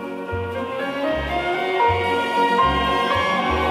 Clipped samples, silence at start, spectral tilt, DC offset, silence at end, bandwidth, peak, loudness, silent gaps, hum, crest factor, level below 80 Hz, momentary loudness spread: under 0.1%; 0 s; -5.5 dB/octave; under 0.1%; 0 s; 16 kHz; -8 dBFS; -20 LUFS; none; none; 14 dB; -38 dBFS; 9 LU